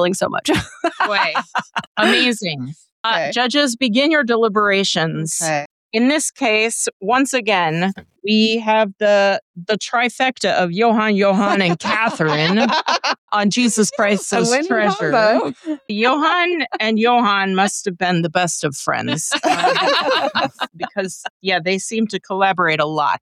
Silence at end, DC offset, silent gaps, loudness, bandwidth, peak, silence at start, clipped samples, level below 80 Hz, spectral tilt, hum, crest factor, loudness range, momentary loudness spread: 0.05 s; under 0.1%; 1.87-1.95 s, 2.92-3.04 s, 5.66-5.90 s, 6.93-7.00 s, 9.42-9.54 s, 13.18-13.28 s, 21.30-21.40 s; -17 LUFS; 14.5 kHz; -4 dBFS; 0 s; under 0.1%; -58 dBFS; -3.5 dB/octave; none; 14 dB; 2 LU; 8 LU